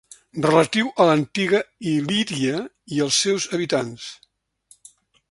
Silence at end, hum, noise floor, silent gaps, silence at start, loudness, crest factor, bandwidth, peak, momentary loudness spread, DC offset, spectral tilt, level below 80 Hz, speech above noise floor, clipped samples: 1.2 s; none; -57 dBFS; none; 0.35 s; -21 LUFS; 22 dB; 11.5 kHz; 0 dBFS; 12 LU; under 0.1%; -4 dB/octave; -62 dBFS; 36 dB; under 0.1%